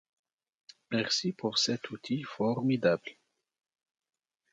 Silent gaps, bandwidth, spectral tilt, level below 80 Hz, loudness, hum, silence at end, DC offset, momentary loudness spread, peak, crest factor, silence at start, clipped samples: none; 9.2 kHz; -4 dB/octave; -74 dBFS; -31 LUFS; none; 1.4 s; under 0.1%; 8 LU; -12 dBFS; 22 dB; 0.9 s; under 0.1%